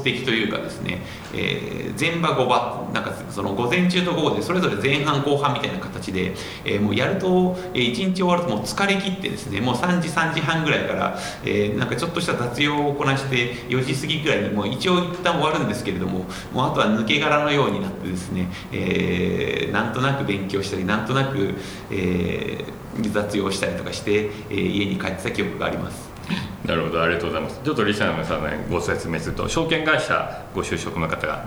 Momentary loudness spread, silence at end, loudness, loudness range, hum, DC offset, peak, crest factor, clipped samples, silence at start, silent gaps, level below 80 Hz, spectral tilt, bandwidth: 8 LU; 0 s; -23 LUFS; 3 LU; none; under 0.1%; -4 dBFS; 20 dB; under 0.1%; 0 s; none; -46 dBFS; -5.5 dB/octave; over 20 kHz